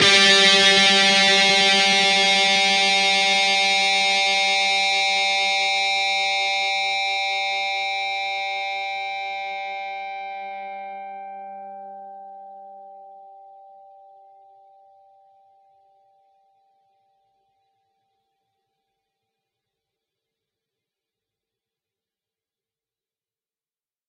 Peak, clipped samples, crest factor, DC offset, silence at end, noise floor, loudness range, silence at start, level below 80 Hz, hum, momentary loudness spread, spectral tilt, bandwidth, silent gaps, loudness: -2 dBFS; under 0.1%; 22 dB; under 0.1%; 10.8 s; under -90 dBFS; 21 LU; 0 s; -72 dBFS; none; 21 LU; -0.5 dB/octave; 12 kHz; none; -17 LUFS